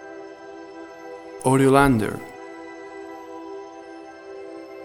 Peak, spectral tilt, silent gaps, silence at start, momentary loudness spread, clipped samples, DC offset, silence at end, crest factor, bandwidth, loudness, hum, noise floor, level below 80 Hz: -2 dBFS; -6.5 dB/octave; none; 0 s; 23 LU; under 0.1%; under 0.1%; 0 s; 22 dB; 16.5 kHz; -19 LUFS; none; -40 dBFS; -46 dBFS